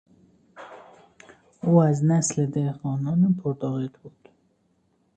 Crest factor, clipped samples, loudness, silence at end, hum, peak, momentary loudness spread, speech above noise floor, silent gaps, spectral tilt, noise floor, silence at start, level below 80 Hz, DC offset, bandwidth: 20 dB; under 0.1%; -23 LUFS; 1.1 s; none; -6 dBFS; 18 LU; 45 dB; none; -7.5 dB/octave; -67 dBFS; 0.55 s; -64 dBFS; under 0.1%; 9.4 kHz